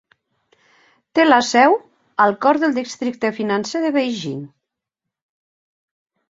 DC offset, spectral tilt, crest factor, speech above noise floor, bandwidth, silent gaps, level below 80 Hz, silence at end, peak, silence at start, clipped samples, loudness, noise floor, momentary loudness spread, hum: under 0.1%; -4 dB/octave; 20 dB; 66 dB; 7.8 kHz; none; -66 dBFS; 1.85 s; -2 dBFS; 1.15 s; under 0.1%; -18 LUFS; -83 dBFS; 12 LU; none